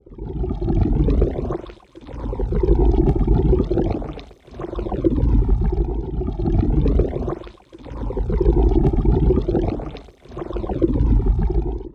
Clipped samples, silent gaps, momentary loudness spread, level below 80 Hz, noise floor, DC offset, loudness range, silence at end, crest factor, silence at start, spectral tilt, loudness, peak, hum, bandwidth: under 0.1%; none; 16 LU; -22 dBFS; -39 dBFS; under 0.1%; 2 LU; 0.05 s; 16 dB; 0.1 s; -11 dB/octave; -21 LUFS; -2 dBFS; none; 4.4 kHz